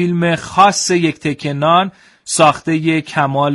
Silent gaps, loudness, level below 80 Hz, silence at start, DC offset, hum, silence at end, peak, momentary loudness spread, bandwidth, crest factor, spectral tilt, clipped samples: none; -14 LUFS; -52 dBFS; 0 s; under 0.1%; none; 0 s; 0 dBFS; 9 LU; 11.5 kHz; 14 dB; -4.5 dB/octave; under 0.1%